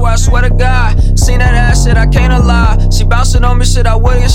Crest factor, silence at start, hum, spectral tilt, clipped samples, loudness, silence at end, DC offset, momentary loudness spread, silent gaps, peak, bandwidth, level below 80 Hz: 6 dB; 0 s; none; -5 dB/octave; 0.6%; -10 LUFS; 0 s; 1%; 2 LU; none; 0 dBFS; 13 kHz; -8 dBFS